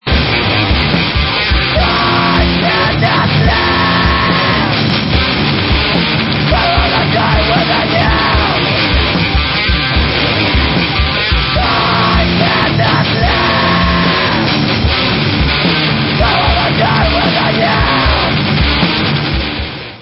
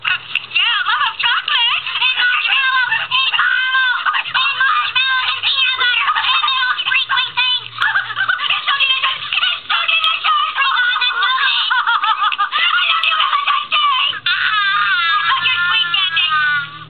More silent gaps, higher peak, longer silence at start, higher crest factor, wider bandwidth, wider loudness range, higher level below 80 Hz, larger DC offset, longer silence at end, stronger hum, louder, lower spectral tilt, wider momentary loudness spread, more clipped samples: neither; about the same, 0 dBFS vs 0 dBFS; about the same, 0.05 s vs 0 s; about the same, 12 dB vs 16 dB; first, 5.8 kHz vs 4.8 kHz; about the same, 1 LU vs 1 LU; first, -20 dBFS vs -70 dBFS; second, under 0.1% vs 0.3%; about the same, 0 s vs 0 s; neither; first, -11 LUFS vs -14 LUFS; first, -8.5 dB/octave vs 5.5 dB/octave; about the same, 2 LU vs 3 LU; neither